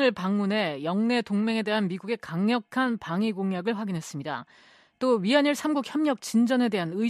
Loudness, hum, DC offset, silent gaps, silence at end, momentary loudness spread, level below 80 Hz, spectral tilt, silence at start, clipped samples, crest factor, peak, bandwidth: -26 LUFS; none; under 0.1%; none; 0 s; 9 LU; -72 dBFS; -5.5 dB/octave; 0 s; under 0.1%; 16 dB; -10 dBFS; 13.5 kHz